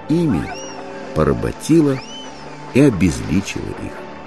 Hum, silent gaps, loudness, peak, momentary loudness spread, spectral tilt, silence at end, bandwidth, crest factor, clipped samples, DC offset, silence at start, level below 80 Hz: none; none; -18 LUFS; 0 dBFS; 16 LU; -6.5 dB/octave; 0 s; 13 kHz; 18 dB; under 0.1%; 1%; 0 s; -36 dBFS